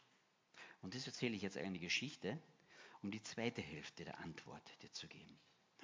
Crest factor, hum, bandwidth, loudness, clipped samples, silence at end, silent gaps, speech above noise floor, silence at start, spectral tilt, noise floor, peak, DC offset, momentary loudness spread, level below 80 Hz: 22 dB; none; 7.6 kHz; -47 LUFS; under 0.1%; 0 s; none; 29 dB; 0 s; -4 dB/octave; -77 dBFS; -26 dBFS; under 0.1%; 20 LU; -78 dBFS